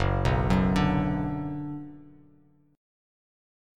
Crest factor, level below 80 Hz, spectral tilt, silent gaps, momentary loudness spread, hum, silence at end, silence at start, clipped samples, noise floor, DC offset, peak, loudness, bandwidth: 18 dB; -38 dBFS; -7.5 dB/octave; none; 14 LU; none; 1.65 s; 0 s; under 0.1%; -61 dBFS; under 0.1%; -10 dBFS; -27 LUFS; 10.5 kHz